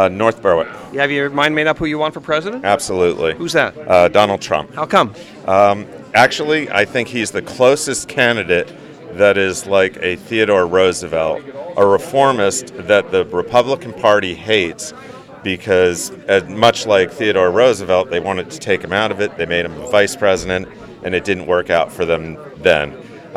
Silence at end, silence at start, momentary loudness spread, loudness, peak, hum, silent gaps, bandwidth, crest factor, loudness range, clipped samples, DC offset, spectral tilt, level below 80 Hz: 0 s; 0 s; 10 LU; -15 LUFS; 0 dBFS; none; none; 15 kHz; 16 dB; 3 LU; under 0.1%; under 0.1%; -4 dB/octave; -48 dBFS